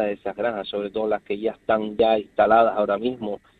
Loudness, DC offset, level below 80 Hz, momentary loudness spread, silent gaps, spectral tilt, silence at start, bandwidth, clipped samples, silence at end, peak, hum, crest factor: -23 LUFS; under 0.1%; -56 dBFS; 10 LU; none; -7.5 dB/octave; 0 s; 4.6 kHz; under 0.1%; 0.25 s; -4 dBFS; none; 18 dB